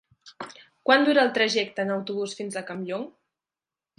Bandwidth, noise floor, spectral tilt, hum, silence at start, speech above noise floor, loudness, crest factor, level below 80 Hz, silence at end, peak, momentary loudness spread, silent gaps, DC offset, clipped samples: 11.5 kHz; under -90 dBFS; -4 dB/octave; none; 0.25 s; over 66 dB; -24 LUFS; 22 dB; -78 dBFS; 0.9 s; -6 dBFS; 21 LU; none; under 0.1%; under 0.1%